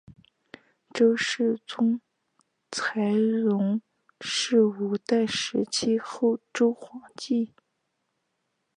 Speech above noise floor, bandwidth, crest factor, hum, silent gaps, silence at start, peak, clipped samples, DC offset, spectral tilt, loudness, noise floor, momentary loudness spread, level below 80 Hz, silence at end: 53 dB; 10.5 kHz; 16 dB; none; none; 0.1 s; -10 dBFS; under 0.1%; under 0.1%; -4.5 dB/octave; -26 LUFS; -78 dBFS; 12 LU; -74 dBFS; 1.3 s